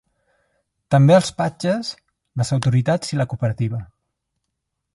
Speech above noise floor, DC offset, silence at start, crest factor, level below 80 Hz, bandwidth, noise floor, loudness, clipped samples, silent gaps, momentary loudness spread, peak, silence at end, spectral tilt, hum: 59 dB; under 0.1%; 0.9 s; 18 dB; -52 dBFS; 11.5 kHz; -78 dBFS; -19 LUFS; under 0.1%; none; 12 LU; -2 dBFS; 1.1 s; -6.5 dB/octave; none